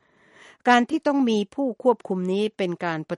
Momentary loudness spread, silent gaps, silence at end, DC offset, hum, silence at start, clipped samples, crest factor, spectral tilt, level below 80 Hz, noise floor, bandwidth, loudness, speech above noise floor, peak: 8 LU; none; 0 s; under 0.1%; none; 0.65 s; under 0.1%; 20 dB; -6 dB/octave; -72 dBFS; -53 dBFS; 11.5 kHz; -23 LUFS; 30 dB; -4 dBFS